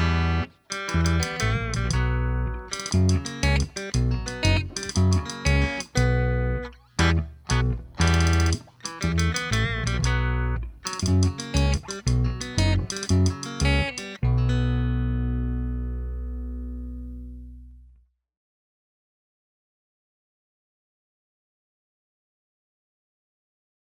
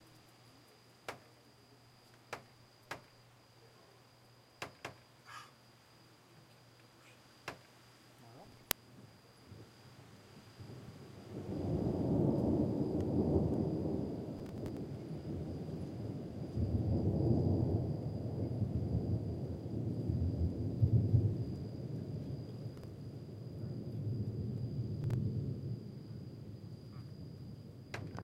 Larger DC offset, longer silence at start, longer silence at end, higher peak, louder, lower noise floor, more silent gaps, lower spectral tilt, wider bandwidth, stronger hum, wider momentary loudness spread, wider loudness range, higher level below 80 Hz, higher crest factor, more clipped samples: neither; about the same, 0 s vs 0 s; first, 6.15 s vs 0 s; second, -6 dBFS vs -2 dBFS; first, -25 LUFS vs -39 LUFS; second, -58 dBFS vs -63 dBFS; neither; second, -5 dB/octave vs -7.5 dB/octave; first, over 20 kHz vs 16 kHz; neither; second, 10 LU vs 23 LU; second, 9 LU vs 19 LU; first, -30 dBFS vs -56 dBFS; second, 18 dB vs 36 dB; neither